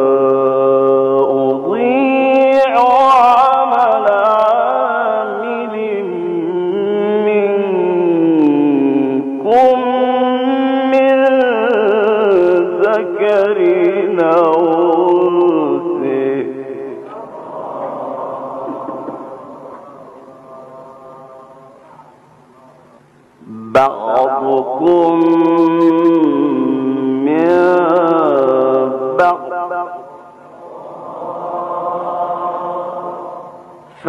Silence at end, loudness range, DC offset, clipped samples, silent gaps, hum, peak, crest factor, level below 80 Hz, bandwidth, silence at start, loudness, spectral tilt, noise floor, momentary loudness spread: 0 s; 13 LU; under 0.1%; under 0.1%; none; none; -4 dBFS; 10 dB; -60 dBFS; 7.2 kHz; 0 s; -13 LUFS; -7.5 dB/octave; -46 dBFS; 15 LU